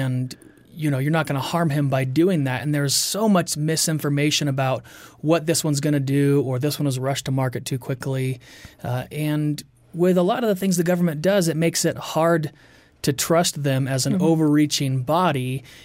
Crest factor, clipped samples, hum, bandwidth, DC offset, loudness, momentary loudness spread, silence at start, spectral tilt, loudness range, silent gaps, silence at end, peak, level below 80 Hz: 14 dB; under 0.1%; none; 16 kHz; under 0.1%; -21 LUFS; 9 LU; 0 s; -5 dB/octave; 4 LU; none; 0.05 s; -8 dBFS; -58 dBFS